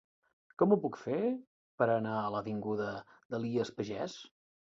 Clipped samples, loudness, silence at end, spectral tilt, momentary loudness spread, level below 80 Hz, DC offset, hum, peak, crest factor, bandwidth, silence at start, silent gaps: under 0.1%; -34 LUFS; 0.45 s; -7 dB/octave; 13 LU; -72 dBFS; under 0.1%; none; -14 dBFS; 20 dB; 7.8 kHz; 0.6 s; 1.47-1.78 s, 3.25-3.30 s